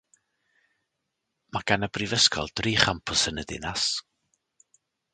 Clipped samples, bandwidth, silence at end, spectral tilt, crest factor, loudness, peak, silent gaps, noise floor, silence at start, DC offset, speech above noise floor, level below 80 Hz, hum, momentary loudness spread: under 0.1%; 9.6 kHz; 1.15 s; -2.5 dB/octave; 28 dB; -25 LUFS; 0 dBFS; none; -81 dBFS; 1.55 s; under 0.1%; 55 dB; -50 dBFS; none; 12 LU